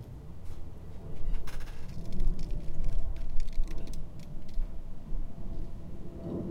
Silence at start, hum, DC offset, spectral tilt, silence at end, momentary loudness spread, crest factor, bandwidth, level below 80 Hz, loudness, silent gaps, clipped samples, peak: 0 s; none; under 0.1%; -7 dB/octave; 0 s; 9 LU; 14 dB; 5.6 kHz; -32 dBFS; -42 LUFS; none; under 0.1%; -12 dBFS